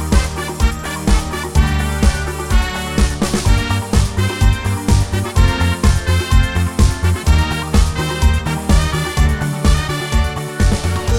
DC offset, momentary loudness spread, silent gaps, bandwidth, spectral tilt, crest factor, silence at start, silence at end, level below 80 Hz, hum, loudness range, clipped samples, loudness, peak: 0.8%; 3 LU; none; 16.5 kHz; -5 dB/octave; 14 dB; 0 s; 0 s; -18 dBFS; none; 2 LU; under 0.1%; -17 LUFS; -2 dBFS